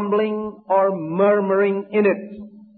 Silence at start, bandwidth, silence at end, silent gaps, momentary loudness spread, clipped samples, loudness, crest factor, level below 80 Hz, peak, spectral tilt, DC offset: 0 s; 4.3 kHz; 0.15 s; none; 11 LU; under 0.1%; -20 LUFS; 14 dB; -64 dBFS; -6 dBFS; -12 dB/octave; under 0.1%